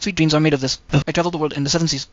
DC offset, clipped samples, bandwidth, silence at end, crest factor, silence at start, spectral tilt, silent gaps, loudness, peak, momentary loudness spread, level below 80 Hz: 0.2%; under 0.1%; 7.8 kHz; 0.1 s; 16 dB; 0 s; -5 dB/octave; none; -19 LUFS; -4 dBFS; 5 LU; -42 dBFS